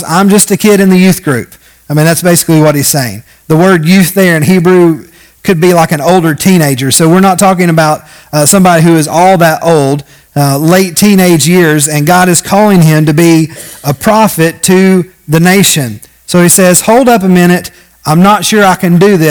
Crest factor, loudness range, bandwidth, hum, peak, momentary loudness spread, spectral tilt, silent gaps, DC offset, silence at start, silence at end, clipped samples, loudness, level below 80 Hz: 6 dB; 1 LU; over 20 kHz; none; 0 dBFS; 8 LU; -5 dB/octave; none; under 0.1%; 0 s; 0 s; 6%; -6 LUFS; -42 dBFS